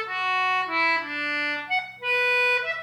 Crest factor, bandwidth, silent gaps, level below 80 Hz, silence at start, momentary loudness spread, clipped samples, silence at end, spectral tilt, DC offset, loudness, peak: 12 dB; 19 kHz; none; -78 dBFS; 0 s; 6 LU; under 0.1%; 0 s; -2 dB/octave; under 0.1%; -23 LUFS; -12 dBFS